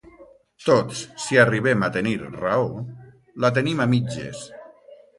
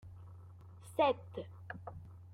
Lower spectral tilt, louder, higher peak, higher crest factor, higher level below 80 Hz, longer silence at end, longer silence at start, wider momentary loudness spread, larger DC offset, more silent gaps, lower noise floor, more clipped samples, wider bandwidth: about the same, -5.5 dB/octave vs -6 dB/octave; first, -22 LUFS vs -38 LUFS; first, -2 dBFS vs -18 dBFS; about the same, 20 dB vs 22 dB; first, -56 dBFS vs -68 dBFS; first, 0.25 s vs 0 s; first, 0.2 s vs 0.05 s; second, 17 LU vs 22 LU; neither; neither; second, -50 dBFS vs -54 dBFS; neither; second, 11.5 kHz vs 15.5 kHz